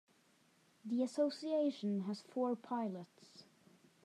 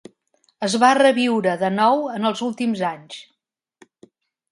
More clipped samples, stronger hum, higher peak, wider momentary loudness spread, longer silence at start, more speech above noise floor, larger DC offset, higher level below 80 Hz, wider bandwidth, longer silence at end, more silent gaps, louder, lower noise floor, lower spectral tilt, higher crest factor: neither; neither; second, -24 dBFS vs -2 dBFS; first, 19 LU vs 14 LU; first, 0.85 s vs 0.6 s; second, 34 dB vs 45 dB; neither; second, under -90 dBFS vs -72 dBFS; about the same, 12.5 kHz vs 11.5 kHz; second, 0.65 s vs 1.3 s; neither; second, -39 LUFS vs -19 LUFS; first, -72 dBFS vs -64 dBFS; first, -6.5 dB/octave vs -4.5 dB/octave; about the same, 16 dB vs 20 dB